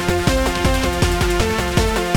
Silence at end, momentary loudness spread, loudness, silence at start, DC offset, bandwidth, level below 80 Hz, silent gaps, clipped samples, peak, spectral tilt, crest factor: 0 s; 1 LU; -18 LUFS; 0 s; under 0.1%; 19 kHz; -24 dBFS; none; under 0.1%; -2 dBFS; -4.5 dB/octave; 14 dB